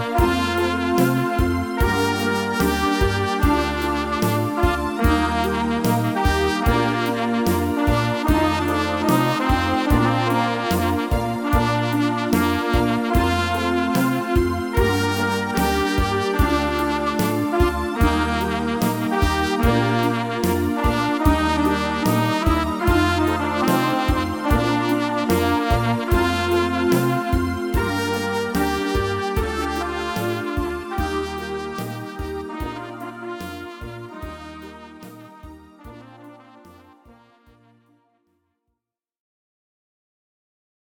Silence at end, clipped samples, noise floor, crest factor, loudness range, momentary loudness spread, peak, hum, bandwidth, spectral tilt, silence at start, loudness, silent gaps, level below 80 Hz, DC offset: 4.15 s; under 0.1%; -82 dBFS; 18 dB; 9 LU; 9 LU; -4 dBFS; none; 19 kHz; -5.5 dB/octave; 0 s; -21 LUFS; none; -30 dBFS; under 0.1%